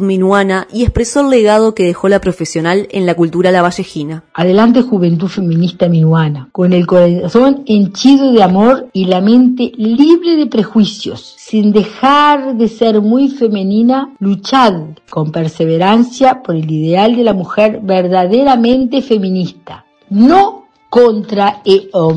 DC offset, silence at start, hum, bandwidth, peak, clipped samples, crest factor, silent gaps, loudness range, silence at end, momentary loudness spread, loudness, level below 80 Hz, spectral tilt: under 0.1%; 0 s; none; 10.5 kHz; 0 dBFS; 0.3%; 10 dB; none; 3 LU; 0 s; 8 LU; -11 LUFS; -36 dBFS; -6.5 dB/octave